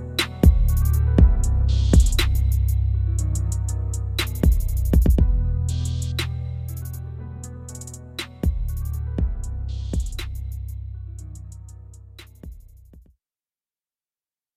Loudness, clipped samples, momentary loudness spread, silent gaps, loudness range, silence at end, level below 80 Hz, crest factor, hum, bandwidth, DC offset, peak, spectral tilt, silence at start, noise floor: -23 LUFS; under 0.1%; 20 LU; none; 17 LU; 1.55 s; -24 dBFS; 18 dB; none; 15.5 kHz; under 0.1%; -4 dBFS; -5.5 dB/octave; 0 s; under -90 dBFS